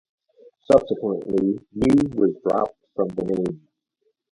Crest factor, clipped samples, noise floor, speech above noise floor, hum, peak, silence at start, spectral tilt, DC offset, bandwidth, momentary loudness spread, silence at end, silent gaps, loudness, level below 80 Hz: 20 dB; under 0.1%; -72 dBFS; 51 dB; none; -2 dBFS; 0.7 s; -8 dB/octave; under 0.1%; 11 kHz; 9 LU; 0.75 s; none; -22 LUFS; -50 dBFS